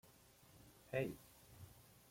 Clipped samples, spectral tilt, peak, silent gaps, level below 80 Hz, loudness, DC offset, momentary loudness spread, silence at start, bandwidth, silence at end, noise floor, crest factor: under 0.1%; -6 dB/octave; -28 dBFS; none; -74 dBFS; -46 LUFS; under 0.1%; 22 LU; 0.05 s; 16.5 kHz; 0.15 s; -67 dBFS; 22 dB